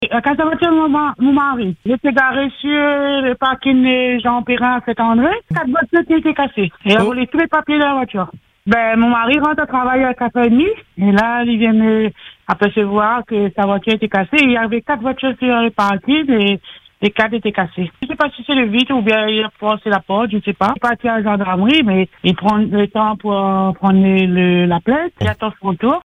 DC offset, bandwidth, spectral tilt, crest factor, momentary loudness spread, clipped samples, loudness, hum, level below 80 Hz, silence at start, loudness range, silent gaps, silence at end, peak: under 0.1%; 9.6 kHz; -7 dB/octave; 14 dB; 6 LU; under 0.1%; -15 LUFS; none; -46 dBFS; 0 s; 2 LU; none; 0 s; 0 dBFS